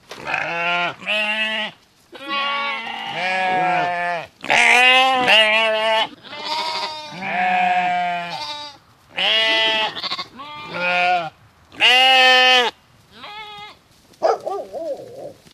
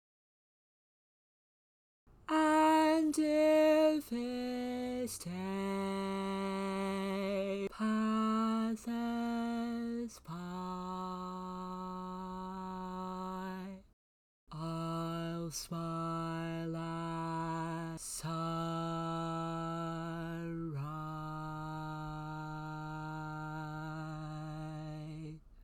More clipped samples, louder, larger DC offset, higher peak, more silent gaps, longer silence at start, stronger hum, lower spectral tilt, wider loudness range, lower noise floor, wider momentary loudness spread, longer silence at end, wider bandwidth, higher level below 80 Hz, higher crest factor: neither; first, -17 LUFS vs -37 LUFS; neither; first, 0 dBFS vs -18 dBFS; second, none vs 13.93-14.47 s; second, 0.1 s vs 2.1 s; neither; second, -1.5 dB/octave vs -6 dB/octave; second, 7 LU vs 12 LU; second, -50 dBFS vs under -90 dBFS; first, 21 LU vs 13 LU; first, 0.2 s vs 0 s; second, 14.5 kHz vs 17.5 kHz; about the same, -66 dBFS vs -62 dBFS; about the same, 20 dB vs 18 dB